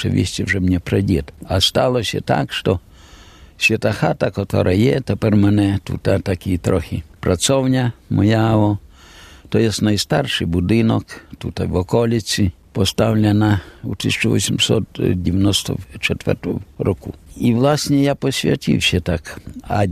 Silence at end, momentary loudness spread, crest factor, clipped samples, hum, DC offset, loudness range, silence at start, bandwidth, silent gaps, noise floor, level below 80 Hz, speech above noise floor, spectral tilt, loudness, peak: 0 s; 8 LU; 16 dB; under 0.1%; none; under 0.1%; 2 LU; 0 s; 14.5 kHz; none; -43 dBFS; -42 dBFS; 25 dB; -5.5 dB/octave; -18 LUFS; 0 dBFS